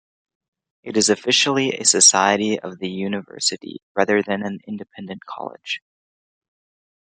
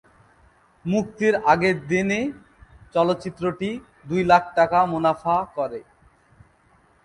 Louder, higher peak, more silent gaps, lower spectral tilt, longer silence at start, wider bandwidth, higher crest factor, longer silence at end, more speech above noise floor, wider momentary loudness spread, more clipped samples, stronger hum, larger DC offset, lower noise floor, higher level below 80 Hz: first, -18 LUFS vs -22 LUFS; about the same, 0 dBFS vs -2 dBFS; first, 3.83-3.95 s vs none; second, -2 dB/octave vs -6 dB/octave; about the same, 0.85 s vs 0.85 s; about the same, 11 kHz vs 11 kHz; about the same, 22 dB vs 20 dB; about the same, 1.3 s vs 1.2 s; first, over 69 dB vs 37 dB; first, 21 LU vs 12 LU; neither; neither; neither; first, under -90 dBFS vs -59 dBFS; second, -70 dBFS vs -54 dBFS